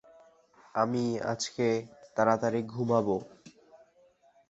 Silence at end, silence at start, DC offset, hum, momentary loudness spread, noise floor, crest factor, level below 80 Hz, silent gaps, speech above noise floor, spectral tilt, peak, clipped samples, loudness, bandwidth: 0.75 s; 0.75 s; under 0.1%; none; 9 LU; -64 dBFS; 22 dB; -68 dBFS; none; 35 dB; -5.5 dB/octave; -10 dBFS; under 0.1%; -30 LUFS; 8.2 kHz